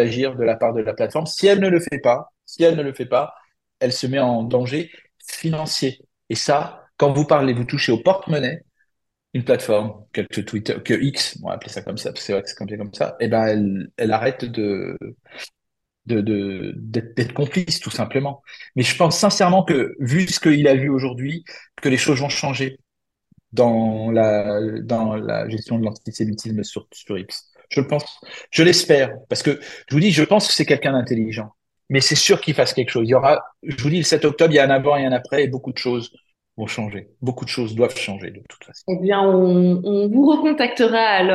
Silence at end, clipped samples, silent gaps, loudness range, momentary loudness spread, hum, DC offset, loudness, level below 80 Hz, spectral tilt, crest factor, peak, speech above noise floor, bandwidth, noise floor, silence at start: 0 s; under 0.1%; none; 7 LU; 15 LU; none; under 0.1%; -19 LUFS; -58 dBFS; -5 dB/octave; 20 dB; 0 dBFS; 57 dB; 12.5 kHz; -76 dBFS; 0 s